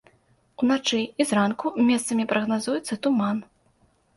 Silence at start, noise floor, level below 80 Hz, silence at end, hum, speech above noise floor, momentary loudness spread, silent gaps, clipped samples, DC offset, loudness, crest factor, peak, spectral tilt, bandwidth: 0.6 s; -63 dBFS; -66 dBFS; 0.75 s; none; 40 dB; 5 LU; none; under 0.1%; under 0.1%; -24 LUFS; 16 dB; -8 dBFS; -4.5 dB/octave; 11.5 kHz